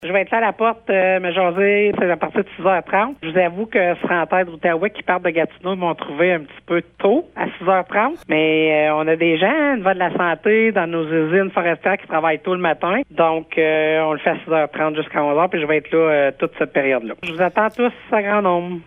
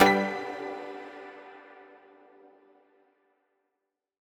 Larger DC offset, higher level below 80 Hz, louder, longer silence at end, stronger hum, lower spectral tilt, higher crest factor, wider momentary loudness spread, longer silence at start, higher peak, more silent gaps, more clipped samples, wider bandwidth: neither; first, -58 dBFS vs -70 dBFS; first, -18 LUFS vs -30 LUFS; second, 0.05 s vs 2.4 s; neither; first, -8 dB/octave vs -4.5 dB/octave; second, 16 dB vs 26 dB; second, 5 LU vs 25 LU; about the same, 0 s vs 0 s; first, -2 dBFS vs -6 dBFS; neither; neither; second, 3.9 kHz vs 17.5 kHz